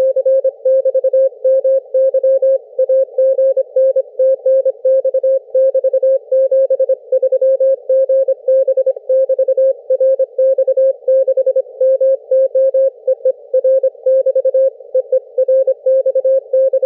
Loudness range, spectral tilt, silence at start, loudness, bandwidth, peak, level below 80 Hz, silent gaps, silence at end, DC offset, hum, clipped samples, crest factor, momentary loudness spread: 1 LU; -7 dB/octave; 0 s; -14 LUFS; 1.7 kHz; -6 dBFS; -88 dBFS; none; 0 s; under 0.1%; none; under 0.1%; 8 dB; 3 LU